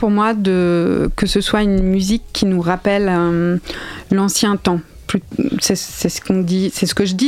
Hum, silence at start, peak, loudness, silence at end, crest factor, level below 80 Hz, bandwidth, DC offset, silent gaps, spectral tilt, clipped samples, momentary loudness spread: none; 0 s; 0 dBFS; -17 LUFS; 0 s; 16 dB; -32 dBFS; 15.5 kHz; under 0.1%; none; -5 dB/octave; under 0.1%; 6 LU